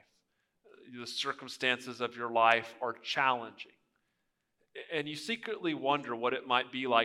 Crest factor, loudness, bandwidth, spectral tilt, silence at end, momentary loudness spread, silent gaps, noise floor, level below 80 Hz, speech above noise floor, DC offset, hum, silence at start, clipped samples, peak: 24 dB; -32 LUFS; 14.5 kHz; -3.5 dB/octave; 0 s; 18 LU; none; -81 dBFS; -86 dBFS; 48 dB; under 0.1%; none; 0.8 s; under 0.1%; -10 dBFS